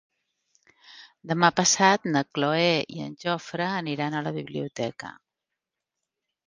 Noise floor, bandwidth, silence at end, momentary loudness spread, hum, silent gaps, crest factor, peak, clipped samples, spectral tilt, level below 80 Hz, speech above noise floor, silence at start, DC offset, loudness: -86 dBFS; 10.5 kHz; 1.35 s; 14 LU; none; none; 24 dB; -2 dBFS; under 0.1%; -3.5 dB/octave; -70 dBFS; 61 dB; 0.9 s; under 0.1%; -25 LUFS